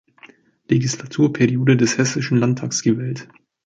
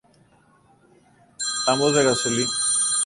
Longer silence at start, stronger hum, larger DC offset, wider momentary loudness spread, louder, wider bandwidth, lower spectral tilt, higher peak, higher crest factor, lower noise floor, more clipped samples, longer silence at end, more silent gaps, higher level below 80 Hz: second, 0.7 s vs 1.4 s; neither; neither; about the same, 8 LU vs 7 LU; about the same, -19 LUFS vs -20 LUFS; second, 9.2 kHz vs 11.5 kHz; first, -5.5 dB/octave vs -2 dB/octave; first, -2 dBFS vs -6 dBFS; about the same, 16 dB vs 18 dB; second, -49 dBFS vs -57 dBFS; neither; first, 0.4 s vs 0 s; neither; about the same, -58 dBFS vs -60 dBFS